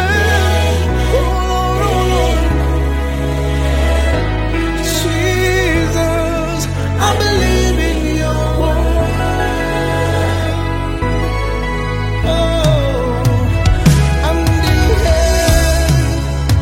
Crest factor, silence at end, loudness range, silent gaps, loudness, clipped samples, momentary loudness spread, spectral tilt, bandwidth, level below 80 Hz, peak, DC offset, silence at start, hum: 14 dB; 0 s; 3 LU; none; -15 LUFS; under 0.1%; 5 LU; -5.5 dB/octave; 16.5 kHz; -18 dBFS; 0 dBFS; under 0.1%; 0 s; none